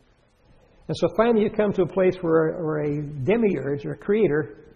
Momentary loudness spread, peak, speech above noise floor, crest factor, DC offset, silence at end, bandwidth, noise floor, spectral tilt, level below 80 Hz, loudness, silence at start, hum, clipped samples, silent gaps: 7 LU; -6 dBFS; 37 dB; 18 dB; under 0.1%; 0.15 s; 9.4 kHz; -59 dBFS; -8 dB/octave; -52 dBFS; -23 LUFS; 0.9 s; none; under 0.1%; none